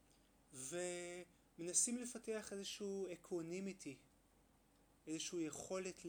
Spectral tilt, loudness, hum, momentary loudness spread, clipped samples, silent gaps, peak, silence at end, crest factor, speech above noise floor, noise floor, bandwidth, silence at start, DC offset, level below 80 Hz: -3 dB/octave; -45 LUFS; none; 17 LU; under 0.1%; none; -24 dBFS; 0 s; 24 dB; 28 dB; -74 dBFS; over 20 kHz; 0.5 s; under 0.1%; -78 dBFS